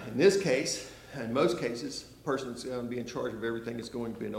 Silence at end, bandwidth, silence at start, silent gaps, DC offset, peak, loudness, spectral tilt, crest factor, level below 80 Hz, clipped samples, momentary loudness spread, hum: 0 s; 16 kHz; 0 s; none; under 0.1%; -12 dBFS; -32 LUFS; -4.5 dB/octave; 20 dB; -62 dBFS; under 0.1%; 13 LU; none